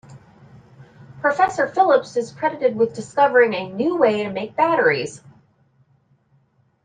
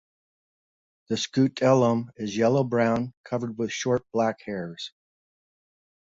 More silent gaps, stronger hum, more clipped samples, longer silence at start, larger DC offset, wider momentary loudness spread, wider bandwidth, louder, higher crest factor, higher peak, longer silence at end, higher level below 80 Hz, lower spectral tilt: second, none vs 3.17-3.24 s; neither; neither; second, 0.1 s vs 1.1 s; neither; second, 8 LU vs 13 LU; first, 9.6 kHz vs 7.8 kHz; first, -19 LUFS vs -25 LUFS; about the same, 18 dB vs 20 dB; first, -4 dBFS vs -8 dBFS; first, 1.65 s vs 1.25 s; about the same, -64 dBFS vs -64 dBFS; about the same, -5 dB/octave vs -6 dB/octave